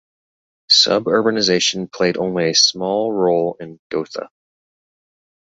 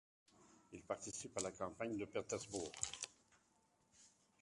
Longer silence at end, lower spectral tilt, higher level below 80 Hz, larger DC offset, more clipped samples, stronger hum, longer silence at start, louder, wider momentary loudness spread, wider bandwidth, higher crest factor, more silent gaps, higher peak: first, 1.15 s vs 0.35 s; about the same, -3 dB/octave vs -3 dB/octave; first, -60 dBFS vs -74 dBFS; neither; neither; neither; first, 0.7 s vs 0.35 s; first, -16 LUFS vs -46 LUFS; first, 14 LU vs 6 LU; second, 8 kHz vs 11.5 kHz; second, 18 dB vs 28 dB; first, 3.79-3.90 s vs none; first, -2 dBFS vs -22 dBFS